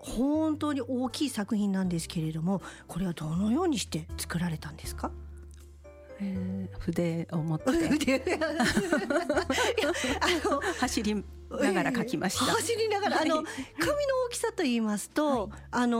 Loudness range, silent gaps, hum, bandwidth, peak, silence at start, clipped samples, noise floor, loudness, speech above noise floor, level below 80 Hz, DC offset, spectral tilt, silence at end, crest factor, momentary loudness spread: 6 LU; none; none; 16 kHz; -14 dBFS; 0 s; under 0.1%; -50 dBFS; -29 LUFS; 20 dB; -48 dBFS; under 0.1%; -4.5 dB/octave; 0 s; 16 dB; 9 LU